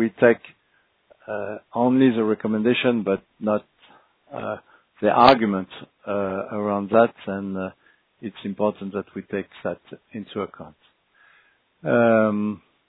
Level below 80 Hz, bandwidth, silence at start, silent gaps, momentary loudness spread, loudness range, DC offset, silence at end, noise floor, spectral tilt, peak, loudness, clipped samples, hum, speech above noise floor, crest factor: -60 dBFS; 5 kHz; 0 s; none; 16 LU; 9 LU; under 0.1%; 0.3 s; -65 dBFS; -8.5 dB/octave; 0 dBFS; -22 LUFS; under 0.1%; none; 43 dB; 24 dB